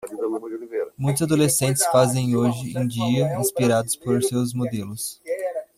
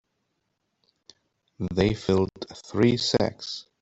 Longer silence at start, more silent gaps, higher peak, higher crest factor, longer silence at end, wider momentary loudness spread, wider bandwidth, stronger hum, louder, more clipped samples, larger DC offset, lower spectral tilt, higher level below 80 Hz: second, 0 s vs 1.6 s; neither; about the same, -6 dBFS vs -6 dBFS; about the same, 18 dB vs 20 dB; about the same, 0.15 s vs 0.2 s; about the same, 11 LU vs 13 LU; first, 16 kHz vs 8.2 kHz; neither; first, -22 LUFS vs -25 LUFS; neither; neither; about the same, -5 dB/octave vs -5.5 dB/octave; second, -58 dBFS vs -52 dBFS